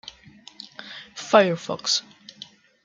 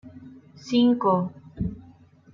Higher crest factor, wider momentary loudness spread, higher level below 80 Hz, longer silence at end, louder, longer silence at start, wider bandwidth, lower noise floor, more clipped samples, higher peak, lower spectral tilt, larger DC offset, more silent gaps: first, 24 dB vs 16 dB; about the same, 24 LU vs 25 LU; second, -70 dBFS vs -50 dBFS; first, 0.85 s vs 0.55 s; first, -21 LUFS vs -24 LUFS; first, 0.6 s vs 0.05 s; first, 9.4 kHz vs 7.4 kHz; about the same, -49 dBFS vs -52 dBFS; neither; first, -2 dBFS vs -10 dBFS; second, -3 dB/octave vs -7.5 dB/octave; neither; neither